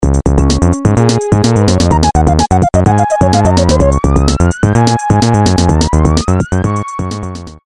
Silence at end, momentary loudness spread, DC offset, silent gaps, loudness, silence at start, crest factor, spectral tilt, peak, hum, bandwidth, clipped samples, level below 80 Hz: 0.15 s; 5 LU; 0.2%; none; -11 LUFS; 0 s; 10 dB; -6 dB/octave; 0 dBFS; none; 11.5 kHz; under 0.1%; -18 dBFS